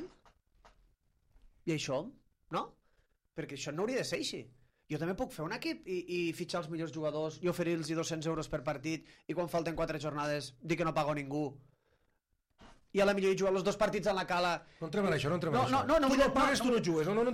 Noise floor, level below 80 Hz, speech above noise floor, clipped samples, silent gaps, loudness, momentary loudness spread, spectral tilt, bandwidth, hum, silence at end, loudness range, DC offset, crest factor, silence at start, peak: -78 dBFS; -58 dBFS; 45 dB; under 0.1%; none; -34 LUFS; 11 LU; -5 dB/octave; 15.5 kHz; none; 0 s; 9 LU; under 0.1%; 18 dB; 0 s; -16 dBFS